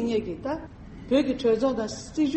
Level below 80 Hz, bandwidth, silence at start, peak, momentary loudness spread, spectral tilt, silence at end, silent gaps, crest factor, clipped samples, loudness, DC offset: -48 dBFS; 8.4 kHz; 0 s; -10 dBFS; 13 LU; -5.5 dB/octave; 0 s; none; 16 dB; under 0.1%; -27 LUFS; under 0.1%